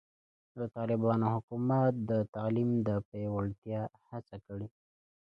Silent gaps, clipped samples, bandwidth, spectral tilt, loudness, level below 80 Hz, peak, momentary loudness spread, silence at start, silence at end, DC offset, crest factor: 1.43-1.48 s, 2.29-2.33 s, 3.05-3.12 s, 3.58-3.62 s; under 0.1%; 5.2 kHz; -11 dB/octave; -33 LUFS; -62 dBFS; -16 dBFS; 16 LU; 0.55 s; 0.7 s; under 0.1%; 18 dB